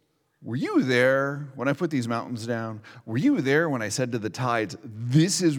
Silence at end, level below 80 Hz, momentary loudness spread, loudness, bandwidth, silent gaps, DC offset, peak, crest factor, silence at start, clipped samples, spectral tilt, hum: 0 s; -74 dBFS; 13 LU; -25 LUFS; 18 kHz; none; under 0.1%; -8 dBFS; 18 dB; 0.4 s; under 0.1%; -5.5 dB/octave; none